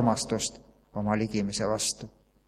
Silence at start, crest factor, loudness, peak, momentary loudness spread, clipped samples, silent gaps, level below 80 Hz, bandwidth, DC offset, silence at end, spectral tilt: 0 s; 20 dB; -29 LUFS; -10 dBFS; 12 LU; under 0.1%; none; -56 dBFS; 15 kHz; under 0.1%; 0.4 s; -4 dB/octave